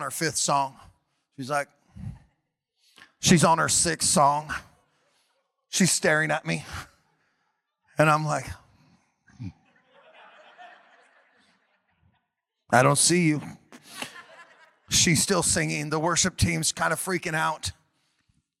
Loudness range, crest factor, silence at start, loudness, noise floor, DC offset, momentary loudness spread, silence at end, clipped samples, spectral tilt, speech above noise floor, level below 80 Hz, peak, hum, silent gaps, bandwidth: 7 LU; 24 dB; 0 s; -23 LUFS; -81 dBFS; under 0.1%; 22 LU; 0.9 s; under 0.1%; -3.5 dB/octave; 57 dB; -52 dBFS; -4 dBFS; none; none; 16.5 kHz